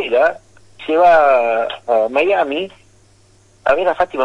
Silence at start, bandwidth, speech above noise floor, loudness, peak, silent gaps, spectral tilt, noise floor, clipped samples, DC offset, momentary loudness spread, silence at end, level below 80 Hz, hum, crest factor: 0 s; 10 kHz; 36 dB; -15 LUFS; -4 dBFS; none; -4.5 dB/octave; -51 dBFS; under 0.1%; under 0.1%; 12 LU; 0 s; -52 dBFS; none; 12 dB